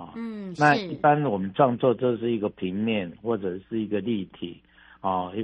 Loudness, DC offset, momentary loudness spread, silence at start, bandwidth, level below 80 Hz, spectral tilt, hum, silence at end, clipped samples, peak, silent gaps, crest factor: -25 LUFS; under 0.1%; 13 LU; 0 s; 9 kHz; -64 dBFS; -7 dB/octave; none; 0 s; under 0.1%; -6 dBFS; none; 20 dB